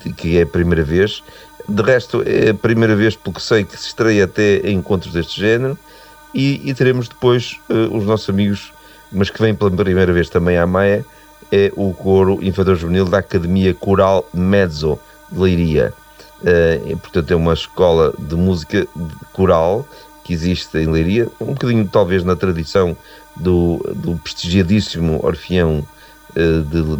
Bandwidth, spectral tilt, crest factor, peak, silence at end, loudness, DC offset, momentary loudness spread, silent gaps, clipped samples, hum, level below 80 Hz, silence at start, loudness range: over 20 kHz; -7 dB/octave; 14 dB; -2 dBFS; 0 s; -16 LUFS; under 0.1%; 9 LU; none; under 0.1%; none; -34 dBFS; 0 s; 3 LU